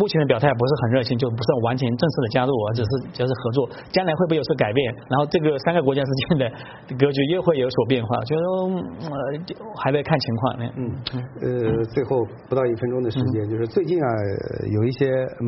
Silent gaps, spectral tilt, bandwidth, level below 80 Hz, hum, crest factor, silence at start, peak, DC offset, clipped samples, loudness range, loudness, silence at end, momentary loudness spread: none; -6 dB/octave; 6 kHz; -52 dBFS; none; 20 dB; 0 s; -2 dBFS; under 0.1%; under 0.1%; 3 LU; -22 LUFS; 0 s; 8 LU